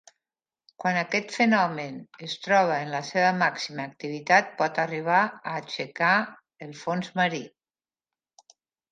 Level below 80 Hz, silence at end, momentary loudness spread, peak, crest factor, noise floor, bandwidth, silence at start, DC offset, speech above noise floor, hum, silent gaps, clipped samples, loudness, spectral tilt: -78 dBFS; 1.45 s; 14 LU; -4 dBFS; 22 dB; under -90 dBFS; 9.4 kHz; 0.8 s; under 0.1%; over 64 dB; none; none; under 0.1%; -25 LUFS; -4.5 dB/octave